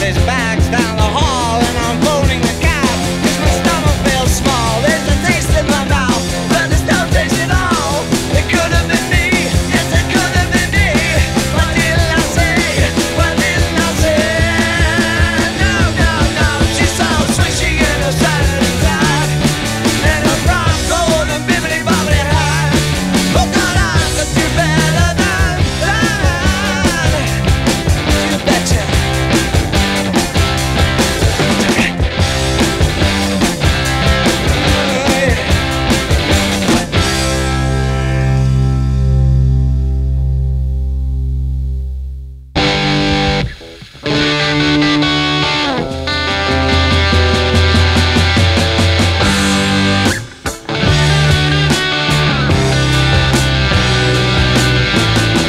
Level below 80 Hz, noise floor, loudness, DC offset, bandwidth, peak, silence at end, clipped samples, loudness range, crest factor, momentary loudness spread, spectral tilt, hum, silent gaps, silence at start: -20 dBFS; -33 dBFS; -13 LUFS; under 0.1%; 16 kHz; 0 dBFS; 0 s; under 0.1%; 2 LU; 12 dB; 4 LU; -4.5 dB/octave; none; none; 0 s